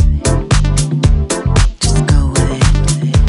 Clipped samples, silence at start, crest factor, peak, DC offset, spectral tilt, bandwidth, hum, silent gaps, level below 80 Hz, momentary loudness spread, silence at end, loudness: under 0.1%; 0 s; 12 dB; 0 dBFS; under 0.1%; -5 dB/octave; 11.5 kHz; none; none; -14 dBFS; 2 LU; 0 s; -13 LUFS